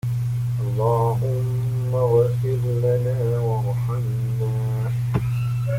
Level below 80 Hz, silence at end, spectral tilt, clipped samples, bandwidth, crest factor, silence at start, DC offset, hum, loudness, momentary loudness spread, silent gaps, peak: -44 dBFS; 0 s; -8.5 dB/octave; under 0.1%; 15.5 kHz; 14 dB; 0.05 s; under 0.1%; 50 Hz at -40 dBFS; -22 LUFS; 5 LU; none; -8 dBFS